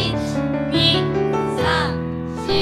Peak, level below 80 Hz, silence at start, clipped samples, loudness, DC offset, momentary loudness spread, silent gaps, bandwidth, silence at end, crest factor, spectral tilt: -4 dBFS; -38 dBFS; 0 s; under 0.1%; -20 LUFS; under 0.1%; 9 LU; none; 13.5 kHz; 0 s; 16 dB; -5.5 dB/octave